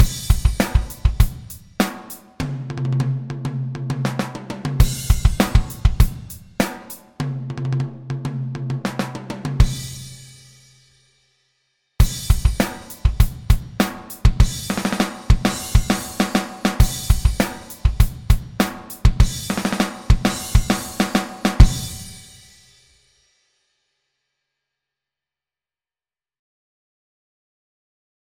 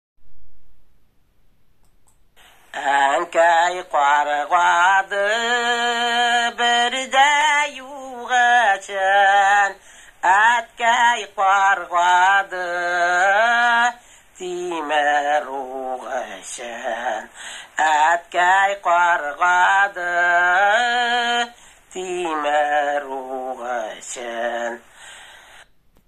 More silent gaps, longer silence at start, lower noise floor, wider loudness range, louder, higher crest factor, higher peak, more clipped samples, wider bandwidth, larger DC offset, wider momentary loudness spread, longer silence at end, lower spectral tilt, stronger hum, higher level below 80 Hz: neither; second, 0 s vs 0.2 s; first, under -90 dBFS vs -58 dBFS; about the same, 6 LU vs 7 LU; second, -21 LUFS vs -18 LUFS; about the same, 20 dB vs 16 dB; first, 0 dBFS vs -4 dBFS; neither; first, 17.5 kHz vs 13 kHz; neither; second, 10 LU vs 14 LU; first, 6.15 s vs 0.75 s; first, -5.5 dB/octave vs -0.5 dB/octave; neither; first, -22 dBFS vs -62 dBFS